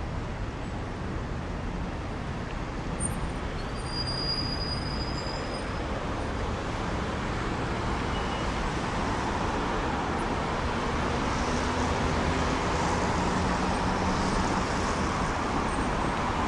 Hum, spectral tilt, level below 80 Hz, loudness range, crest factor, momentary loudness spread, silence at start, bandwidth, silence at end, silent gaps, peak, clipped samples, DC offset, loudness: none; -5 dB/octave; -36 dBFS; 5 LU; 14 dB; 7 LU; 0 s; 12 kHz; 0 s; none; -14 dBFS; under 0.1%; under 0.1%; -30 LUFS